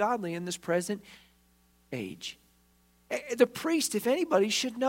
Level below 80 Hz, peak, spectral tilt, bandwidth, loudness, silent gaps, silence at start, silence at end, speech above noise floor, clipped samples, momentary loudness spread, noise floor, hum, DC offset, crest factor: -70 dBFS; -10 dBFS; -3.5 dB/octave; 16.5 kHz; -30 LUFS; none; 0 s; 0 s; 36 dB; under 0.1%; 13 LU; -66 dBFS; none; under 0.1%; 22 dB